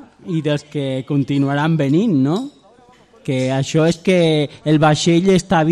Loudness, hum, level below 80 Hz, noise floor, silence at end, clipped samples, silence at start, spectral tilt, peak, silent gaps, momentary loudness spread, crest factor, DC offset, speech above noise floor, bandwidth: -17 LUFS; none; -50 dBFS; -48 dBFS; 0 s; under 0.1%; 0.25 s; -6.5 dB/octave; -2 dBFS; none; 9 LU; 14 dB; under 0.1%; 33 dB; 11 kHz